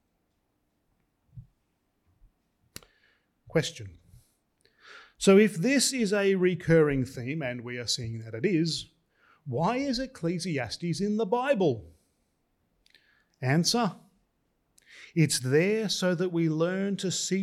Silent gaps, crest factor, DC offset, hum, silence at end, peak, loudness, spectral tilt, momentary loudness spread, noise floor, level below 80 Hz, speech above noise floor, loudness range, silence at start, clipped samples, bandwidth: none; 20 dB; under 0.1%; none; 0 s; -10 dBFS; -27 LUFS; -5 dB/octave; 11 LU; -75 dBFS; -60 dBFS; 49 dB; 13 LU; 1.35 s; under 0.1%; 15 kHz